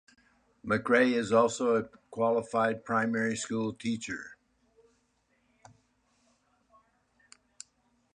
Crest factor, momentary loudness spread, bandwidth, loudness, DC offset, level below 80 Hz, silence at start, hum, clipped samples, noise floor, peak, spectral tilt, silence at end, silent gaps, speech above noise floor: 20 dB; 23 LU; 10.5 kHz; -29 LUFS; under 0.1%; -70 dBFS; 0.65 s; none; under 0.1%; -73 dBFS; -12 dBFS; -5 dB/octave; 3.8 s; none; 44 dB